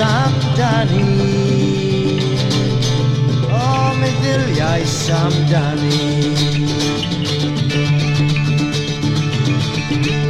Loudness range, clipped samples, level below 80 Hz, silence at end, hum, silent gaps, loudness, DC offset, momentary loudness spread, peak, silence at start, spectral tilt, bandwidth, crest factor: 1 LU; under 0.1%; -40 dBFS; 0 s; none; none; -16 LUFS; under 0.1%; 3 LU; -4 dBFS; 0 s; -6 dB/octave; 12 kHz; 12 dB